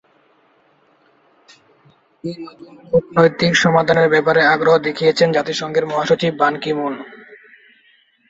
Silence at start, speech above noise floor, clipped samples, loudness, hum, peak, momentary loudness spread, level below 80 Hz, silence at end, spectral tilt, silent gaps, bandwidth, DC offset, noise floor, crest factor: 2.25 s; 41 dB; under 0.1%; -15 LUFS; none; 0 dBFS; 17 LU; -56 dBFS; 0.95 s; -5 dB/octave; none; 8 kHz; under 0.1%; -56 dBFS; 18 dB